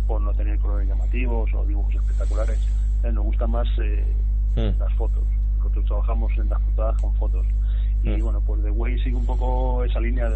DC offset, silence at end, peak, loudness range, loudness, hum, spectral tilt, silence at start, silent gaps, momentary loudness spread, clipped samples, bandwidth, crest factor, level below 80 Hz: under 0.1%; 0 s; -10 dBFS; 0 LU; -24 LUFS; 50 Hz at -20 dBFS; -8.5 dB/octave; 0 s; none; 1 LU; under 0.1%; 3.9 kHz; 10 dB; -20 dBFS